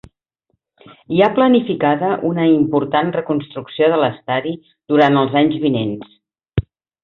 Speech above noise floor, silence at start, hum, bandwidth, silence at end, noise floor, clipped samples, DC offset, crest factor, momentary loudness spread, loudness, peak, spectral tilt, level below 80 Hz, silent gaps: 54 dB; 1.1 s; none; 5.6 kHz; 0.45 s; -70 dBFS; under 0.1%; under 0.1%; 16 dB; 11 LU; -17 LUFS; -2 dBFS; -9 dB/octave; -44 dBFS; none